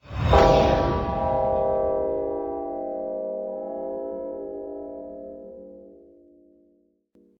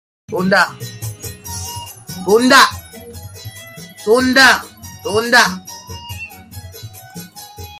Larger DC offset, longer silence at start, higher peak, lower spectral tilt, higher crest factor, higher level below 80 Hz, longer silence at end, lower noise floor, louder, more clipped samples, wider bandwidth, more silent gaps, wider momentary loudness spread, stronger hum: neither; second, 0.05 s vs 0.3 s; about the same, -2 dBFS vs 0 dBFS; first, -7 dB/octave vs -3 dB/octave; first, 24 dB vs 18 dB; first, -36 dBFS vs -52 dBFS; first, 1.45 s vs 0 s; first, -64 dBFS vs -35 dBFS; second, -24 LUFS vs -13 LUFS; neither; about the same, 17.5 kHz vs 16 kHz; neither; second, 21 LU vs 24 LU; neither